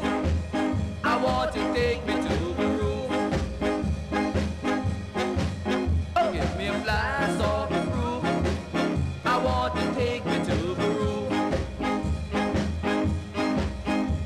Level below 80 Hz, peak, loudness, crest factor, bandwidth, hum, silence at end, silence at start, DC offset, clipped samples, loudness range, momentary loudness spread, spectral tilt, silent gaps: -36 dBFS; -12 dBFS; -27 LUFS; 14 dB; 13 kHz; none; 0 s; 0 s; under 0.1%; under 0.1%; 1 LU; 3 LU; -6.5 dB/octave; none